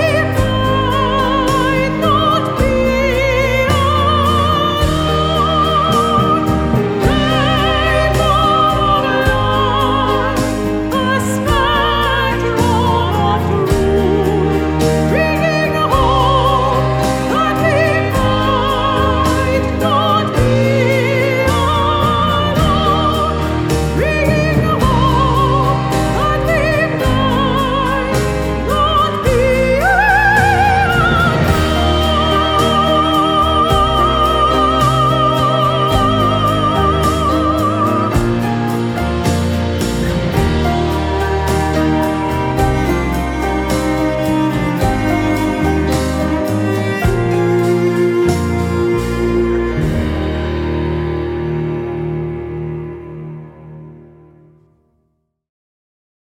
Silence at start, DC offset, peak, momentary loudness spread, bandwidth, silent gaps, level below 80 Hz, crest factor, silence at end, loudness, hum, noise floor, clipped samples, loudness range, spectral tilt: 0 s; under 0.1%; 0 dBFS; 5 LU; 19.5 kHz; none; -24 dBFS; 14 dB; 2.25 s; -14 LUFS; none; -65 dBFS; under 0.1%; 4 LU; -6 dB/octave